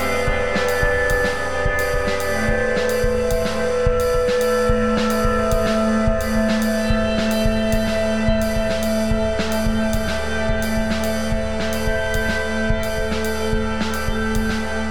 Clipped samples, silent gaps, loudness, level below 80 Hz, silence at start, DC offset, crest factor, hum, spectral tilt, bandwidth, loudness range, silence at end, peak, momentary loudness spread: under 0.1%; none; -20 LUFS; -26 dBFS; 0 s; 3%; 14 dB; none; -5 dB/octave; 19 kHz; 3 LU; 0 s; -4 dBFS; 4 LU